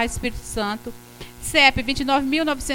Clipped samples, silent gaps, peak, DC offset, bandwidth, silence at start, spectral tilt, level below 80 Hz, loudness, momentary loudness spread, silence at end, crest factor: under 0.1%; none; 0 dBFS; under 0.1%; 17 kHz; 0 s; -3 dB/octave; -38 dBFS; -20 LUFS; 21 LU; 0 s; 22 dB